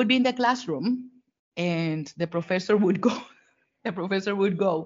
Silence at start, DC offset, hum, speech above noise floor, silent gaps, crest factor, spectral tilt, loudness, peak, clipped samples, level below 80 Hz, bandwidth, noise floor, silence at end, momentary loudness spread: 0 s; under 0.1%; none; 40 dB; 1.39-1.52 s; 16 dB; -4.5 dB/octave; -26 LUFS; -8 dBFS; under 0.1%; -72 dBFS; 7.4 kHz; -65 dBFS; 0 s; 11 LU